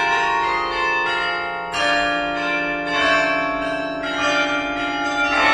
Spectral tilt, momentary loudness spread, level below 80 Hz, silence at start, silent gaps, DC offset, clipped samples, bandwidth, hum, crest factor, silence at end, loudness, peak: -3 dB/octave; 6 LU; -48 dBFS; 0 s; none; under 0.1%; under 0.1%; 12 kHz; none; 16 dB; 0 s; -20 LUFS; -4 dBFS